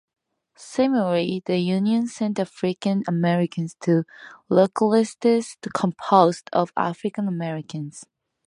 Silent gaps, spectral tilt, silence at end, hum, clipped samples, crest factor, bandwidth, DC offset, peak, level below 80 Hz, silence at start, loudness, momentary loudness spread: none; -6.5 dB/octave; 0.45 s; none; under 0.1%; 20 dB; 11 kHz; under 0.1%; -2 dBFS; -68 dBFS; 0.6 s; -22 LUFS; 10 LU